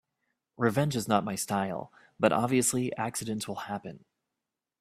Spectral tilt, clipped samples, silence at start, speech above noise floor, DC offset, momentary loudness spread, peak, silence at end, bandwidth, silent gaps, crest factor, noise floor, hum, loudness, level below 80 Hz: -4.5 dB/octave; under 0.1%; 0.6 s; 58 dB; under 0.1%; 13 LU; -6 dBFS; 0.8 s; 15.5 kHz; none; 24 dB; -88 dBFS; none; -30 LUFS; -66 dBFS